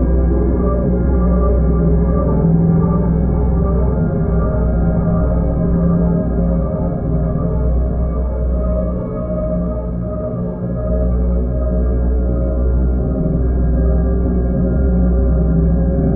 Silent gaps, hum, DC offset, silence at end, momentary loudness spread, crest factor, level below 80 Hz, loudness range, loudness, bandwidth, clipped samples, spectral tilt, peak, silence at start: none; none; under 0.1%; 0 s; 5 LU; 14 dB; -18 dBFS; 5 LU; -17 LUFS; 2.3 kHz; under 0.1%; -15.5 dB/octave; -2 dBFS; 0 s